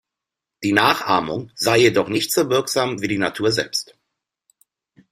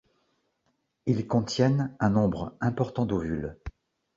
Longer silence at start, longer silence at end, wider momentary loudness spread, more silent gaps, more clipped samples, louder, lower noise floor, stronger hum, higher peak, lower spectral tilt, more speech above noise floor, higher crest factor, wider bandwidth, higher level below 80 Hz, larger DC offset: second, 0.6 s vs 1.05 s; first, 1.3 s vs 0.45 s; about the same, 10 LU vs 11 LU; neither; neither; first, -19 LUFS vs -27 LUFS; first, -85 dBFS vs -75 dBFS; neither; first, 0 dBFS vs -8 dBFS; second, -3.5 dB/octave vs -7 dB/octave; first, 66 dB vs 49 dB; about the same, 20 dB vs 20 dB; first, 16 kHz vs 7.8 kHz; second, -58 dBFS vs -50 dBFS; neither